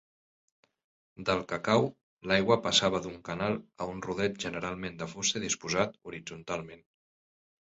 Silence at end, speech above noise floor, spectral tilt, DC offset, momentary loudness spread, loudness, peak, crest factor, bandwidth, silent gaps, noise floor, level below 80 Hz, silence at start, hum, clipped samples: 0.85 s; over 59 dB; -3.5 dB/octave; under 0.1%; 13 LU; -31 LUFS; -10 dBFS; 22 dB; 8.4 kHz; 2.03-2.17 s; under -90 dBFS; -60 dBFS; 1.2 s; none; under 0.1%